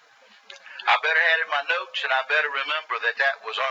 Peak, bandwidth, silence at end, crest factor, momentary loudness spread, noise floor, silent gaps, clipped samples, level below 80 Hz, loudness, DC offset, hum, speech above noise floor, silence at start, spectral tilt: -6 dBFS; 8 kHz; 0 s; 18 dB; 7 LU; -54 dBFS; none; under 0.1%; under -90 dBFS; -22 LUFS; under 0.1%; none; 30 dB; 0.5 s; 2 dB/octave